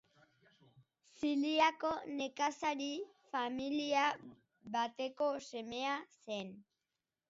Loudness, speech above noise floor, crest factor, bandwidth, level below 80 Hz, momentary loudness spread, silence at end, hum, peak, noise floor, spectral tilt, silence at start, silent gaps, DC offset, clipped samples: -38 LUFS; over 53 dB; 22 dB; 7.6 kHz; -78 dBFS; 12 LU; 0.7 s; none; -18 dBFS; under -90 dBFS; -1.5 dB/octave; 1.2 s; none; under 0.1%; under 0.1%